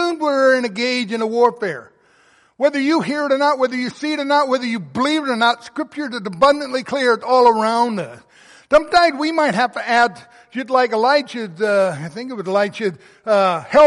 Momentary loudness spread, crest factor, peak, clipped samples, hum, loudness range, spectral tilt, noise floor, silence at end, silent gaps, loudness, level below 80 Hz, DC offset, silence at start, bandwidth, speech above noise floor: 11 LU; 16 dB; -2 dBFS; under 0.1%; none; 3 LU; -4.5 dB/octave; -54 dBFS; 0 s; none; -17 LUFS; -54 dBFS; under 0.1%; 0 s; 11.5 kHz; 37 dB